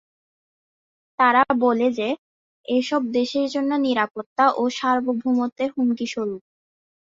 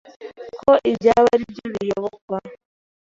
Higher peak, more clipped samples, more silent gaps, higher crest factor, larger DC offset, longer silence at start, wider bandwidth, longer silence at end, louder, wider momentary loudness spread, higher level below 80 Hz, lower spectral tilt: about the same, -4 dBFS vs -2 dBFS; neither; first, 2.18-2.64 s, 4.11-4.15 s, 4.26-4.36 s, 5.52-5.56 s vs 2.21-2.28 s; about the same, 20 dB vs 18 dB; neither; first, 1.2 s vs 0.2 s; about the same, 7.6 kHz vs 7.6 kHz; first, 0.8 s vs 0.5 s; second, -22 LUFS vs -19 LUFS; second, 10 LU vs 19 LU; second, -68 dBFS vs -54 dBFS; second, -4.5 dB/octave vs -6 dB/octave